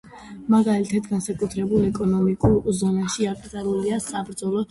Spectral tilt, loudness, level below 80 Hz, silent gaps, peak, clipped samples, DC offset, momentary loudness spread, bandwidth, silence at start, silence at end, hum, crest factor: -6.5 dB/octave; -23 LUFS; -44 dBFS; none; -6 dBFS; under 0.1%; under 0.1%; 8 LU; 11.5 kHz; 0.05 s; 0.05 s; none; 16 dB